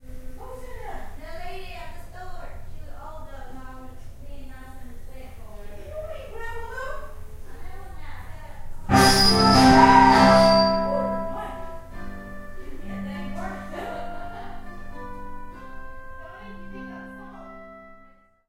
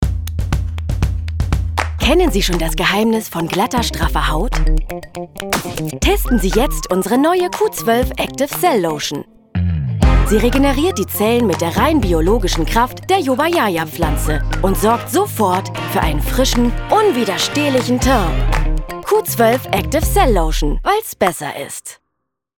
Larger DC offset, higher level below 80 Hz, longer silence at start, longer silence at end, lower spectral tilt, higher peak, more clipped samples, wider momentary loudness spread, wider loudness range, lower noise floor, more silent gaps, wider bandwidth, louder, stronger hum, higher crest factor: neither; second, -38 dBFS vs -22 dBFS; about the same, 0 s vs 0 s; about the same, 0.55 s vs 0.65 s; about the same, -4.5 dB/octave vs -5 dB/octave; about the same, 0 dBFS vs 0 dBFS; neither; first, 28 LU vs 7 LU; first, 25 LU vs 3 LU; second, -53 dBFS vs -75 dBFS; neither; second, 16 kHz vs over 20 kHz; about the same, -18 LUFS vs -16 LUFS; neither; first, 24 dB vs 14 dB